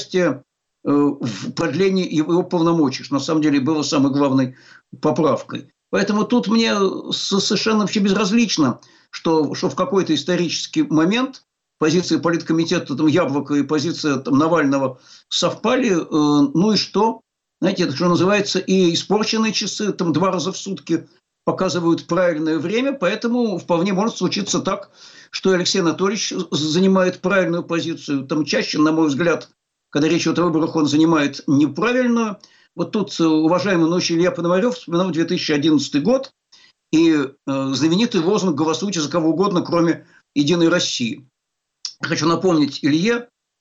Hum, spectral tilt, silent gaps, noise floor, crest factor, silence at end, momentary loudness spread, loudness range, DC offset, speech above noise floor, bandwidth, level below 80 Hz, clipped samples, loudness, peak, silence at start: none; -5 dB/octave; none; -78 dBFS; 12 dB; 0.35 s; 7 LU; 2 LU; under 0.1%; 60 dB; 8 kHz; -60 dBFS; under 0.1%; -19 LUFS; -8 dBFS; 0 s